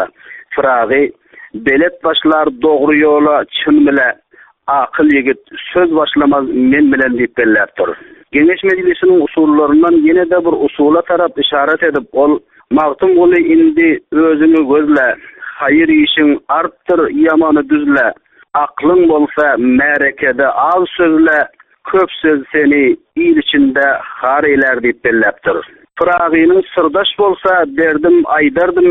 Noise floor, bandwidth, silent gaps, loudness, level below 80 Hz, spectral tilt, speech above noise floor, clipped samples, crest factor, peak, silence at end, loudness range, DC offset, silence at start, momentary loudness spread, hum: -30 dBFS; 4 kHz; none; -11 LUFS; -46 dBFS; -7.5 dB/octave; 20 dB; under 0.1%; 10 dB; 0 dBFS; 0 s; 2 LU; under 0.1%; 0 s; 7 LU; none